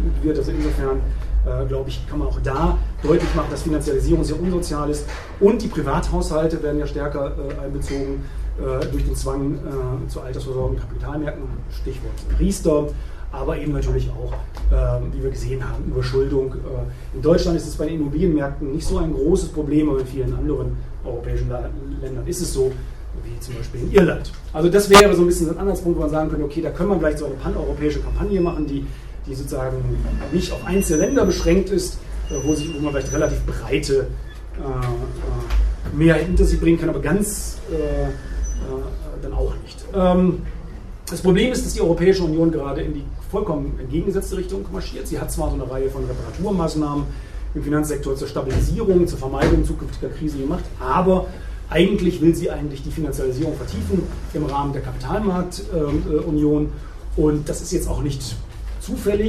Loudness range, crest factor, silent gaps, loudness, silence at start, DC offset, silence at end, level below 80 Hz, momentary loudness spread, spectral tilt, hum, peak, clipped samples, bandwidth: 8 LU; 20 dB; none; -22 LUFS; 0 s; under 0.1%; 0 s; -26 dBFS; 12 LU; -6 dB/octave; none; 0 dBFS; under 0.1%; 13.5 kHz